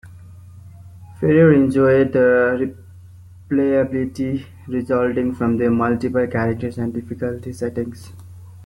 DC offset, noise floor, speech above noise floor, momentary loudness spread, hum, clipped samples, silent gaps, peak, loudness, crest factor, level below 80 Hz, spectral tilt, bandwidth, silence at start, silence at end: under 0.1%; -42 dBFS; 24 dB; 13 LU; none; under 0.1%; none; -2 dBFS; -19 LUFS; 16 dB; -52 dBFS; -8.5 dB/octave; 12 kHz; 0.05 s; 0 s